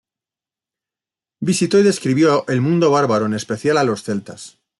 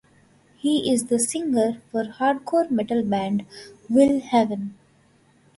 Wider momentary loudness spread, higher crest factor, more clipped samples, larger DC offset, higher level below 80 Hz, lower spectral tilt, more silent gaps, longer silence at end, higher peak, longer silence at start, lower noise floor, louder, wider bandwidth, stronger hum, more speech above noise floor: about the same, 11 LU vs 10 LU; about the same, 14 dB vs 18 dB; neither; neither; about the same, -60 dBFS vs -62 dBFS; about the same, -5.5 dB/octave vs -4.5 dB/octave; neither; second, 0.3 s vs 0.85 s; about the same, -4 dBFS vs -6 dBFS; first, 1.4 s vs 0.65 s; first, -89 dBFS vs -58 dBFS; first, -17 LUFS vs -22 LUFS; about the same, 12 kHz vs 12 kHz; neither; first, 73 dB vs 37 dB